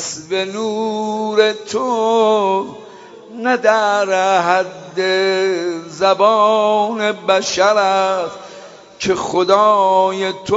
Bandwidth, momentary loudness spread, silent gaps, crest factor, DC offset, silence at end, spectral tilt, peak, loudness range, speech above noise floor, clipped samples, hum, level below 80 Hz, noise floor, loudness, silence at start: 8 kHz; 10 LU; none; 16 dB; under 0.1%; 0 s; -3.5 dB/octave; 0 dBFS; 2 LU; 22 dB; under 0.1%; none; -60 dBFS; -38 dBFS; -15 LUFS; 0 s